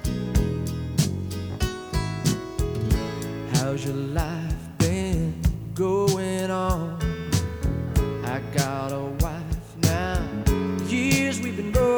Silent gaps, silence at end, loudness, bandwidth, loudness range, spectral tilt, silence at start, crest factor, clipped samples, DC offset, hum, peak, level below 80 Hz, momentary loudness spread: none; 0 s; -26 LUFS; over 20 kHz; 2 LU; -5.5 dB/octave; 0 s; 18 dB; under 0.1%; under 0.1%; none; -6 dBFS; -32 dBFS; 6 LU